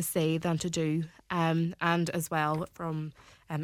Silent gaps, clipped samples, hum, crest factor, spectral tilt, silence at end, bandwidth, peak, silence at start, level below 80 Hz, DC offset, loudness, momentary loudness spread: none; under 0.1%; none; 18 dB; -5.5 dB/octave; 0 s; 17 kHz; -12 dBFS; 0 s; -62 dBFS; under 0.1%; -31 LUFS; 8 LU